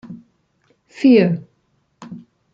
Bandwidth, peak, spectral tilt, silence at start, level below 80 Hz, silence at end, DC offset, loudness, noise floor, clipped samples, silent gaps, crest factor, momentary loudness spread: 7.6 kHz; -2 dBFS; -8.5 dB/octave; 0.1 s; -64 dBFS; 0.35 s; under 0.1%; -15 LUFS; -65 dBFS; under 0.1%; none; 18 dB; 26 LU